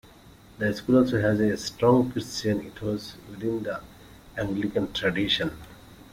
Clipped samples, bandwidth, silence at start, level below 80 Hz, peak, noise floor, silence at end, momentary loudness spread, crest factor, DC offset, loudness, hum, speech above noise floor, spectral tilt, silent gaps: under 0.1%; 16 kHz; 0.25 s; -52 dBFS; -8 dBFS; -51 dBFS; 0.1 s; 13 LU; 20 dB; under 0.1%; -26 LUFS; none; 26 dB; -5.5 dB/octave; none